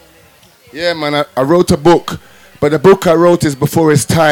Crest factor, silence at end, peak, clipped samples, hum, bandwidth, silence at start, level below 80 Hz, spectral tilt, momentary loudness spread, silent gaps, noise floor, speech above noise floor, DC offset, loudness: 10 dB; 0 s; 0 dBFS; under 0.1%; none; 18.5 kHz; 0.75 s; -40 dBFS; -5.5 dB/octave; 10 LU; none; -45 dBFS; 34 dB; under 0.1%; -11 LUFS